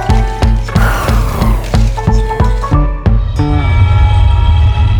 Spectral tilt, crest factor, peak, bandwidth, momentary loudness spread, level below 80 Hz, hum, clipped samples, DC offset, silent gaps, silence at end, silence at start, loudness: -7 dB/octave; 10 dB; 0 dBFS; over 20 kHz; 4 LU; -12 dBFS; none; under 0.1%; under 0.1%; none; 0 s; 0 s; -12 LUFS